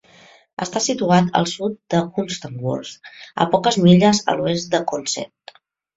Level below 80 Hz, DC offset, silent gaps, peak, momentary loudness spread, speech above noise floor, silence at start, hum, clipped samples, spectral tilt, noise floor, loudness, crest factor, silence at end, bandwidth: -56 dBFS; under 0.1%; none; -2 dBFS; 16 LU; 31 dB; 0.6 s; none; under 0.1%; -5 dB/octave; -49 dBFS; -19 LUFS; 18 dB; 0.7 s; 8 kHz